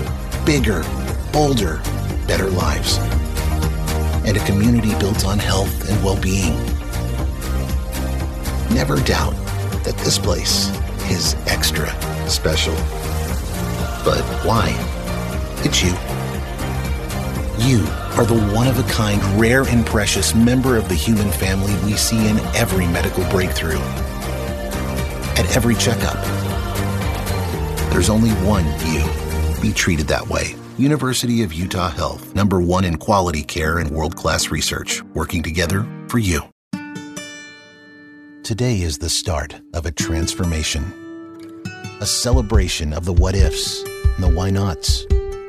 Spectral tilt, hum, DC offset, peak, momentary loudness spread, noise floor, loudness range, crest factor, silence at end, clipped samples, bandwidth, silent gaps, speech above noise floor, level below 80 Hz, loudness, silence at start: -4.5 dB/octave; none; under 0.1%; -2 dBFS; 8 LU; -43 dBFS; 5 LU; 18 dB; 0 s; under 0.1%; 14 kHz; 36.52-36.71 s; 25 dB; -24 dBFS; -19 LUFS; 0 s